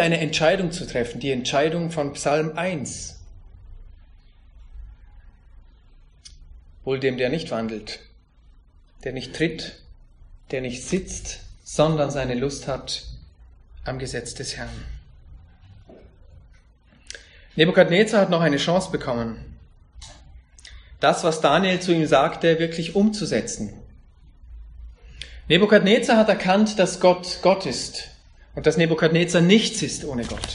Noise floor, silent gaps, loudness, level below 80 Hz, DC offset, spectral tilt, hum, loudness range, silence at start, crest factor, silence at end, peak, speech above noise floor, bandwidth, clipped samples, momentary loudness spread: -54 dBFS; none; -21 LUFS; -46 dBFS; under 0.1%; -5 dB/octave; none; 14 LU; 0 s; 22 dB; 0 s; -2 dBFS; 33 dB; 10.5 kHz; under 0.1%; 20 LU